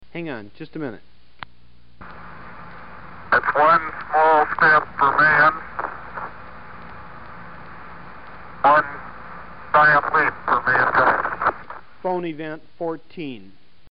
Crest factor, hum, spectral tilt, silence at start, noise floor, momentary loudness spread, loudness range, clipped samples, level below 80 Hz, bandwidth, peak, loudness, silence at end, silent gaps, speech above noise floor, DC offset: 16 dB; none; -9.5 dB/octave; 0 s; -54 dBFS; 25 LU; 8 LU; under 0.1%; -52 dBFS; 5.4 kHz; -6 dBFS; -18 LUFS; 0 s; none; 35 dB; 1%